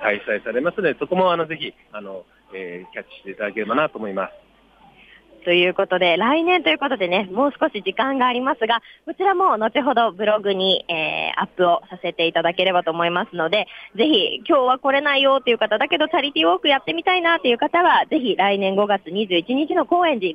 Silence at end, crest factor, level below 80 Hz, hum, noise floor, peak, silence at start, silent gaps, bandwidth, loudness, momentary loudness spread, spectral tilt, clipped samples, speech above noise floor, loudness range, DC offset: 0 s; 14 dB; -64 dBFS; none; -52 dBFS; -6 dBFS; 0 s; none; 6 kHz; -19 LUFS; 12 LU; -6.5 dB/octave; under 0.1%; 33 dB; 7 LU; under 0.1%